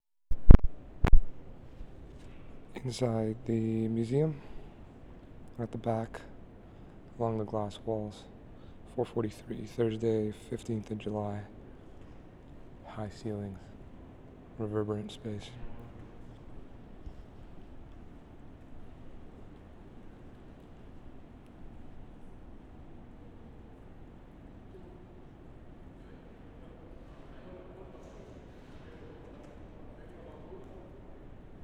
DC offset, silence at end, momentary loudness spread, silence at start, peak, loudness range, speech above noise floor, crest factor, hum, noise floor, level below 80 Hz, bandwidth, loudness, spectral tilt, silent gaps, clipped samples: under 0.1%; 0.5 s; 22 LU; 0.3 s; 0 dBFS; 18 LU; 17 dB; 30 dB; none; -51 dBFS; -34 dBFS; 8 kHz; -33 LUFS; -8 dB/octave; none; under 0.1%